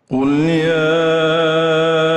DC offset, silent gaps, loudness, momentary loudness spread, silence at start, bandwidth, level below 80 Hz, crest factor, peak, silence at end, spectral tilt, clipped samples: under 0.1%; none; -15 LUFS; 1 LU; 0.1 s; 9.2 kHz; -54 dBFS; 8 dB; -6 dBFS; 0 s; -6 dB/octave; under 0.1%